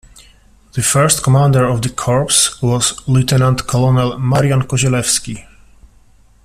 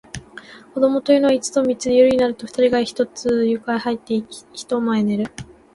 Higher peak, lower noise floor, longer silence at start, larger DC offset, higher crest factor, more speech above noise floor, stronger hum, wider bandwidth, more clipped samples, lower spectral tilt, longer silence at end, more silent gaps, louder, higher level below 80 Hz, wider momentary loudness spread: first, 0 dBFS vs -4 dBFS; first, -47 dBFS vs -41 dBFS; first, 0.75 s vs 0.15 s; neither; about the same, 14 dB vs 16 dB; first, 34 dB vs 23 dB; neither; first, 15 kHz vs 11.5 kHz; neither; about the same, -4.5 dB/octave vs -5 dB/octave; first, 1 s vs 0.3 s; neither; first, -13 LUFS vs -19 LUFS; first, -40 dBFS vs -54 dBFS; second, 6 LU vs 19 LU